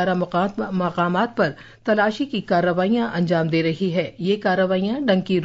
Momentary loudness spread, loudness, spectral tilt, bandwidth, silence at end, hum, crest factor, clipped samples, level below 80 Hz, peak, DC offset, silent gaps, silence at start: 4 LU; -21 LUFS; -7.5 dB/octave; 7.8 kHz; 0 s; none; 14 dB; under 0.1%; -56 dBFS; -6 dBFS; under 0.1%; none; 0 s